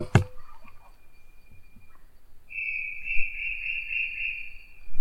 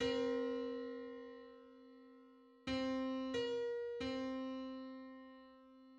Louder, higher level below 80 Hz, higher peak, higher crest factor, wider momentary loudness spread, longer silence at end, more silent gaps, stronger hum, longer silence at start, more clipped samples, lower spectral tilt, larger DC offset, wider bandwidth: first, -29 LUFS vs -43 LUFS; first, -44 dBFS vs -70 dBFS; first, -4 dBFS vs -26 dBFS; first, 24 dB vs 18 dB; second, 14 LU vs 21 LU; about the same, 0 s vs 0 s; neither; neither; about the same, 0 s vs 0 s; neither; about the same, -6 dB/octave vs -5 dB/octave; neither; first, 11 kHz vs 8.6 kHz